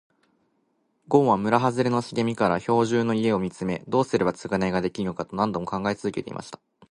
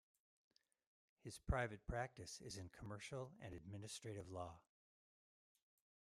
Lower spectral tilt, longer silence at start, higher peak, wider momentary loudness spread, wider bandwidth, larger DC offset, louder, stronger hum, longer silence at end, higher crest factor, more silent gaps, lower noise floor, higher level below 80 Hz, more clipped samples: first, -6.5 dB/octave vs -5 dB/octave; second, 1.1 s vs 1.25 s; first, -4 dBFS vs -28 dBFS; second, 9 LU vs 12 LU; second, 11 kHz vs 15 kHz; neither; first, -24 LUFS vs -51 LUFS; neither; second, 0.35 s vs 1.55 s; about the same, 22 dB vs 26 dB; neither; second, -70 dBFS vs under -90 dBFS; first, -56 dBFS vs -62 dBFS; neither